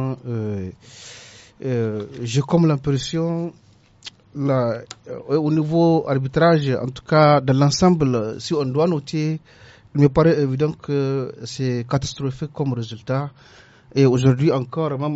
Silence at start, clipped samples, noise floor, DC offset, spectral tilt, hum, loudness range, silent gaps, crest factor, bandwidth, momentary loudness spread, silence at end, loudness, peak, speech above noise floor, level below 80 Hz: 0 s; under 0.1%; -43 dBFS; under 0.1%; -7 dB/octave; none; 6 LU; none; 18 dB; 8 kHz; 16 LU; 0 s; -20 LUFS; -2 dBFS; 23 dB; -48 dBFS